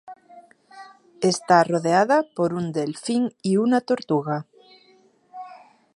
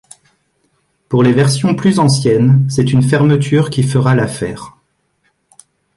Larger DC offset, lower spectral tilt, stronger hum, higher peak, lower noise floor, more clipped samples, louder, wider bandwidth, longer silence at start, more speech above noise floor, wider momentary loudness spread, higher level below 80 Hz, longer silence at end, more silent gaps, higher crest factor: neither; about the same, -5.5 dB/octave vs -6.5 dB/octave; neither; about the same, -2 dBFS vs -2 dBFS; second, -58 dBFS vs -62 dBFS; neither; second, -22 LUFS vs -12 LUFS; about the same, 11.5 kHz vs 11.5 kHz; second, 0.05 s vs 1.1 s; second, 37 dB vs 51 dB; first, 14 LU vs 8 LU; second, -70 dBFS vs -46 dBFS; second, 0.4 s vs 1.3 s; neither; first, 22 dB vs 12 dB